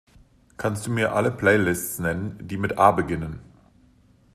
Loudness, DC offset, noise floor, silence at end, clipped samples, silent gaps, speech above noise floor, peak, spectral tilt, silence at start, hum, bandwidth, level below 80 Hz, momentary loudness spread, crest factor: -23 LUFS; under 0.1%; -57 dBFS; 0.9 s; under 0.1%; none; 34 dB; -2 dBFS; -5.5 dB/octave; 0.6 s; none; 14.5 kHz; -50 dBFS; 12 LU; 22 dB